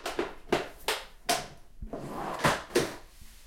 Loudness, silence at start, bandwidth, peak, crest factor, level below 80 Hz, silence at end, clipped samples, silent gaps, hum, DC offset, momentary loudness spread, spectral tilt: -32 LUFS; 0 s; 16.5 kHz; -12 dBFS; 22 dB; -50 dBFS; 0 s; under 0.1%; none; none; under 0.1%; 16 LU; -3.5 dB/octave